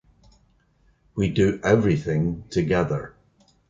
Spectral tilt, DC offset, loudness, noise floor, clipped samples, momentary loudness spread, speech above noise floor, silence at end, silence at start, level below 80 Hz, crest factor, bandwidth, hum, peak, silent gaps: -7.5 dB/octave; under 0.1%; -23 LUFS; -62 dBFS; under 0.1%; 10 LU; 40 dB; 0.6 s; 1.15 s; -44 dBFS; 20 dB; 7.6 kHz; none; -4 dBFS; none